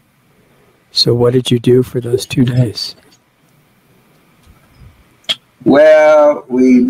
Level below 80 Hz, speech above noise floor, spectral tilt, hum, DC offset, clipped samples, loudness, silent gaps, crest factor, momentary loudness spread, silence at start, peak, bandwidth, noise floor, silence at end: -50 dBFS; 42 dB; -6 dB/octave; none; under 0.1%; under 0.1%; -11 LUFS; none; 12 dB; 13 LU; 0.95 s; 0 dBFS; 15.5 kHz; -52 dBFS; 0 s